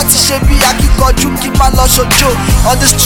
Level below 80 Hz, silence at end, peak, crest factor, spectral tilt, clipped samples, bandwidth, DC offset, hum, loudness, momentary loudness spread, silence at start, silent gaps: -12 dBFS; 0 s; 0 dBFS; 8 dB; -3 dB/octave; 2%; over 20 kHz; under 0.1%; none; -9 LUFS; 4 LU; 0 s; none